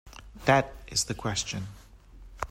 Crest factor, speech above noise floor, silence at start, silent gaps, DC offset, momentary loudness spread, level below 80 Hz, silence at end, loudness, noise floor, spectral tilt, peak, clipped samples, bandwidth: 22 dB; 21 dB; 0.05 s; none; under 0.1%; 17 LU; -48 dBFS; 0 s; -28 LUFS; -50 dBFS; -3.5 dB/octave; -8 dBFS; under 0.1%; 16 kHz